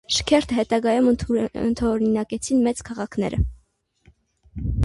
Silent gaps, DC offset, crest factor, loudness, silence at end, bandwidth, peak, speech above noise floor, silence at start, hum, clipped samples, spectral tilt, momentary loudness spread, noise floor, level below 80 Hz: none; under 0.1%; 16 dB; -22 LUFS; 0 s; 11.5 kHz; -6 dBFS; 41 dB; 0.1 s; none; under 0.1%; -5.5 dB/octave; 10 LU; -62 dBFS; -36 dBFS